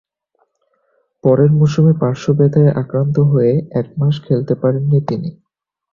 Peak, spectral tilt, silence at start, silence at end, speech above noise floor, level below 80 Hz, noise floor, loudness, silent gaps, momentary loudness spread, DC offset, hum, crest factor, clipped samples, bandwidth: -2 dBFS; -9.5 dB/octave; 1.25 s; 0.6 s; 51 dB; -48 dBFS; -64 dBFS; -15 LUFS; none; 7 LU; under 0.1%; none; 14 dB; under 0.1%; 7.2 kHz